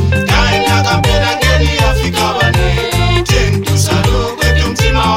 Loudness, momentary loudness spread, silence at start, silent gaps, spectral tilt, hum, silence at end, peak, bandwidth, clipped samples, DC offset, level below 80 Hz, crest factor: -12 LUFS; 2 LU; 0 s; none; -4.5 dB/octave; none; 0 s; 0 dBFS; 16.5 kHz; under 0.1%; 0.6%; -18 dBFS; 12 dB